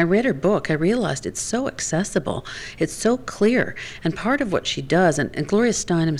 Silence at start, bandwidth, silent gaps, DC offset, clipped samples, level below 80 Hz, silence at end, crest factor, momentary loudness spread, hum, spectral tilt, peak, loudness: 0 s; 13 kHz; none; under 0.1%; under 0.1%; -46 dBFS; 0 s; 14 dB; 8 LU; none; -5 dB/octave; -6 dBFS; -22 LUFS